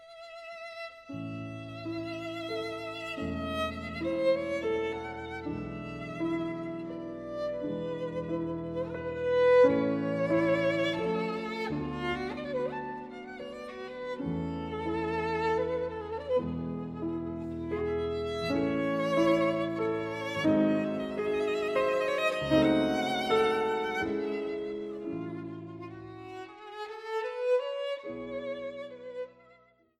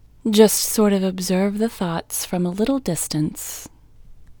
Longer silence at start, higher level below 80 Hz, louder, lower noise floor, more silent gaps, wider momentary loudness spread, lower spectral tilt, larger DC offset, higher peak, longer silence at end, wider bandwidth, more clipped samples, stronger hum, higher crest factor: second, 0 s vs 0.25 s; second, -56 dBFS vs -48 dBFS; second, -31 LUFS vs -20 LUFS; first, -62 dBFS vs -44 dBFS; neither; first, 15 LU vs 11 LU; first, -6.5 dB/octave vs -4.5 dB/octave; neither; second, -12 dBFS vs 0 dBFS; first, 0.45 s vs 0.1 s; second, 13 kHz vs over 20 kHz; neither; neither; about the same, 20 dB vs 20 dB